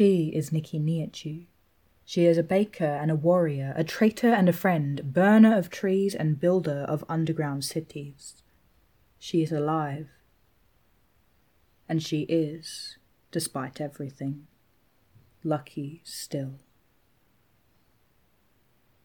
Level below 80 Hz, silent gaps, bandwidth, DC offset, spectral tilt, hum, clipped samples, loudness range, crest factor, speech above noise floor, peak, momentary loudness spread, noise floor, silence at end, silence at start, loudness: -68 dBFS; none; 19 kHz; under 0.1%; -6.5 dB/octave; none; under 0.1%; 14 LU; 18 dB; 42 dB; -8 dBFS; 17 LU; -67 dBFS; 2.45 s; 0 s; -26 LUFS